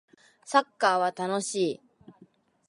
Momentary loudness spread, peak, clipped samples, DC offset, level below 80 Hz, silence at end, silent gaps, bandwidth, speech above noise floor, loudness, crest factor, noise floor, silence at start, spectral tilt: 6 LU; -6 dBFS; under 0.1%; under 0.1%; -80 dBFS; 0.6 s; none; 11.5 kHz; 34 dB; -27 LUFS; 24 dB; -60 dBFS; 0.45 s; -3.5 dB/octave